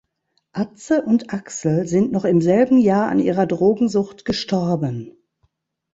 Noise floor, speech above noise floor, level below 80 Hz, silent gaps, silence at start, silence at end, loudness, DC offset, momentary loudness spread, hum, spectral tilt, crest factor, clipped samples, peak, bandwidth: -70 dBFS; 52 dB; -56 dBFS; none; 0.55 s; 0.85 s; -19 LUFS; under 0.1%; 12 LU; none; -6.5 dB/octave; 16 dB; under 0.1%; -4 dBFS; 8 kHz